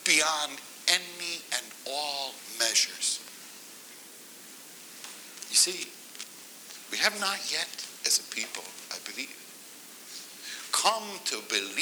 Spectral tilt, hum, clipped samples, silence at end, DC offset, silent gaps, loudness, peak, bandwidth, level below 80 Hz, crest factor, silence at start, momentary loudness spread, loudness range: 1.5 dB/octave; none; under 0.1%; 0 s; under 0.1%; none; -28 LUFS; -6 dBFS; over 20 kHz; -90 dBFS; 26 dB; 0 s; 21 LU; 4 LU